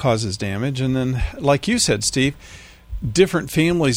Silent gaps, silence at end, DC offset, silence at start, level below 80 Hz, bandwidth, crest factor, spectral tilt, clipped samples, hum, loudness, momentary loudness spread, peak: none; 0 s; under 0.1%; 0 s; -36 dBFS; 16.5 kHz; 18 dB; -4.5 dB/octave; under 0.1%; none; -20 LUFS; 7 LU; -2 dBFS